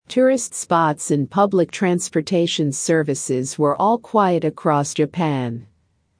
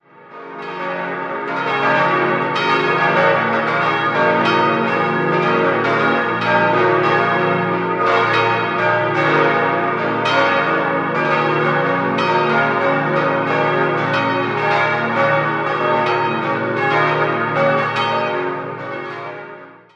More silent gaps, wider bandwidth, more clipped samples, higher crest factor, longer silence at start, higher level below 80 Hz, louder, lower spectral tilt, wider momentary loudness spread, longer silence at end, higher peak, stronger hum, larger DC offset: neither; first, 10.5 kHz vs 8.4 kHz; neither; about the same, 16 dB vs 14 dB; about the same, 0.1 s vs 0.2 s; about the same, -64 dBFS vs -64 dBFS; second, -19 LUFS vs -16 LUFS; second, -5 dB/octave vs -6.5 dB/octave; second, 5 LU vs 9 LU; first, 0.55 s vs 0.2 s; about the same, -4 dBFS vs -2 dBFS; neither; neither